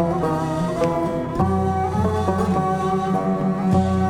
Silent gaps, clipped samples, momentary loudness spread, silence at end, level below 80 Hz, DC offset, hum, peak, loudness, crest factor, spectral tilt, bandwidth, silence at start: none; under 0.1%; 3 LU; 0 s; -40 dBFS; under 0.1%; none; -6 dBFS; -21 LUFS; 14 dB; -8 dB/octave; 12 kHz; 0 s